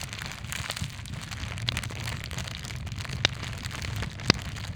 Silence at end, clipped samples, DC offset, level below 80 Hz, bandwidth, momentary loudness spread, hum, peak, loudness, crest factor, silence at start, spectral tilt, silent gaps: 0 s; under 0.1%; under 0.1%; -42 dBFS; over 20 kHz; 10 LU; none; 0 dBFS; -32 LUFS; 32 dB; 0 s; -3.5 dB/octave; none